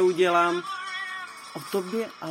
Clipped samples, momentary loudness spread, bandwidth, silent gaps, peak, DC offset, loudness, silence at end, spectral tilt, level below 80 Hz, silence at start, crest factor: under 0.1%; 15 LU; 16 kHz; none; -10 dBFS; under 0.1%; -26 LUFS; 0 s; -4.5 dB/octave; -82 dBFS; 0 s; 16 dB